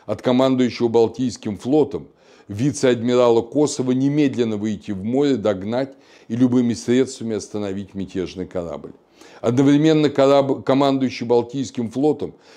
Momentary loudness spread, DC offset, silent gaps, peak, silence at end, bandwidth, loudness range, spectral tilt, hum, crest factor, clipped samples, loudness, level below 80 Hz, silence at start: 12 LU; under 0.1%; none; -2 dBFS; 0.25 s; 10.5 kHz; 4 LU; -6.5 dB/octave; none; 16 dB; under 0.1%; -20 LUFS; -58 dBFS; 0.1 s